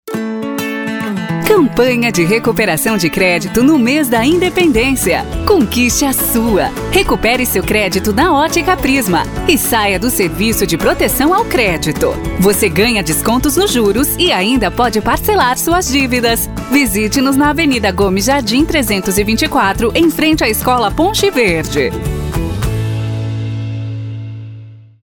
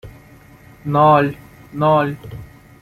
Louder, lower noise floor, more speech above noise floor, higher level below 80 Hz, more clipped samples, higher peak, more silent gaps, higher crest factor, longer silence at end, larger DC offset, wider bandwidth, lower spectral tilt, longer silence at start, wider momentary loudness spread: first, -13 LUFS vs -16 LUFS; second, -33 dBFS vs -44 dBFS; second, 21 dB vs 29 dB; first, -28 dBFS vs -48 dBFS; neither; about the same, 0 dBFS vs -2 dBFS; neither; about the same, 12 dB vs 16 dB; about the same, 0.25 s vs 0.35 s; neither; first, over 20 kHz vs 15 kHz; second, -4 dB/octave vs -8.5 dB/octave; about the same, 0.05 s vs 0.05 s; second, 8 LU vs 23 LU